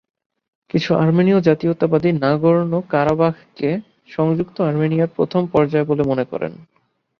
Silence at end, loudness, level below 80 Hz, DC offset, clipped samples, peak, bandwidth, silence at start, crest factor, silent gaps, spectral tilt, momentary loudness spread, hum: 0.55 s; -18 LUFS; -54 dBFS; under 0.1%; under 0.1%; -2 dBFS; 6.6 kHz; 0.75 s; 16 dB; none; -9 dB/octave; 9 LU; none